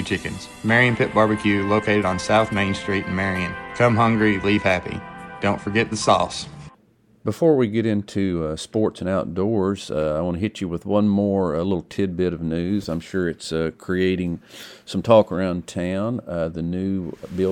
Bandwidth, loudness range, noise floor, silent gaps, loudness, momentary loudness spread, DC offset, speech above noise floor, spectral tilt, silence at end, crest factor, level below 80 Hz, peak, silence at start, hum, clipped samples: 12.5 kHz; 3 LU; -57 dBFS; none; -22 LUFS; 11 LU; under 0.1%; 36 dB; -6 dB/octave; 0 s; 20 dB; -48 dBFS; 0 dBFS; 0 s; none; under 0.1%